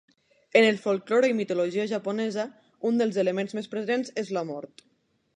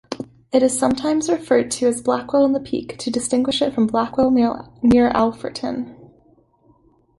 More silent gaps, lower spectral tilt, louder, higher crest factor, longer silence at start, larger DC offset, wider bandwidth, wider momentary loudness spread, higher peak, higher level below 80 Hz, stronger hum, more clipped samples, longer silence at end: neither; about the same, -5.5 dB/octave vs -4.5 dB/octave; second, -26 LUFS vs -19 LUFS; about the same, 20 dB vs 16 dB; first, 0.55 s vs 0.1 s; neither; about the same, 10.5 kHz vs 11.5 kHz; about the same, 12 LU vs 10 LU; about the same, -6 dBFS vs -4 dBFS; second, -80 dBFS vs -50 dBFS; neither; neither; second, 0.7 s vs 1.15 s